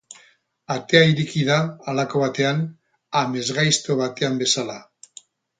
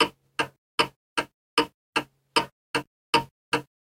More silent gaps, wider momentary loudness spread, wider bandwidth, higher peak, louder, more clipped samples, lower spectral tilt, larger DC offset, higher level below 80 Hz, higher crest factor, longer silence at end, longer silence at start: second, none vs 0.58-0.78 s, 0.96-1.16 s, 1.34-1.57 s, 1.74-1.93 s, 2.52-2.74 s, 2.87-3.13 s, 3.31-3.52 s; first, 13 LU vs 6 LU; second, 9.6 kHz vs 16 kHz; first, 0 dBFS vs -6 dBFS; first, -21 LUFS vs -28 LUFS; neither; first, -4 dB/octave vs -2.5 dB/octave; neither; about the same, -62 dBFS vs -62 dBFS; about the same, 22 dB vs 22 dB; first, 0.8 s vs 0.3 s; about the same, 0.1 s vs 0 s